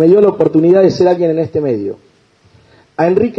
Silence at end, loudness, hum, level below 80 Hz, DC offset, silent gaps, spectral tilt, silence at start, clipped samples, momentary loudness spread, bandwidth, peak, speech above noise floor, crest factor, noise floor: 0.05 s; -12 LUFS; none; -52 dBFS; under 0.1%; none; -8.5 dB/octave; 0 s; under 0.1%; 14 LU; 6.8 kHz; 0 dBFS; 39 dB; 12 dB; -50 dBFS